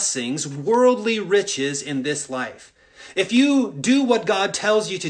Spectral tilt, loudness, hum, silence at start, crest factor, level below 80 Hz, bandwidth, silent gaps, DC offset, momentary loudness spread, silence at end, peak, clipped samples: -3.5 dB/octave; -20 LUFS; none; 0 s; 16 dB; -66 dBFS; 10 kHz; none; under 0.1%; 9 LU; 0 s; -4 dBFS; under 0.1%